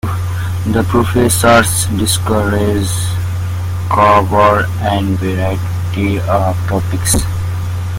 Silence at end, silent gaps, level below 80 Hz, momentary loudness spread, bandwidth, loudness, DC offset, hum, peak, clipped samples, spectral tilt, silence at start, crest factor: 0 s; none; -32 dBFS; 10 LU; 17 kHz; -14 LUFS; under 0.1%; none; 0 dBFS; under 0.1%; -5 dB/octave; 0.05 s; 14 dB